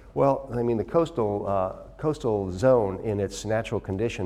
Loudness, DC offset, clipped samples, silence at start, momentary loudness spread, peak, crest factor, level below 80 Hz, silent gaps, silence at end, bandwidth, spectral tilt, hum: -26 LUFS; under 0.1%; under 0.1%; 0 s; 8 LU; -8 dBFS; 16 dB; -48 dBFS; none; 0 s; 12.5 kHz; -7 dB/octave; none